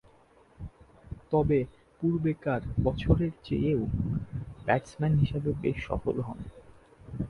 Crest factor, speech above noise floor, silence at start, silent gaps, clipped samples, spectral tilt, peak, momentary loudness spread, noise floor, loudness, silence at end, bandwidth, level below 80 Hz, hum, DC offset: 22 dB; 32 dB; 0.6 s; none; under 0.1%; -9 dB/octave; -8 dBFS; 20 LU; -60 dBFS; -30 LUFS; 0 s; 10.5 kHz; -42 dBFS; none; under 0.1%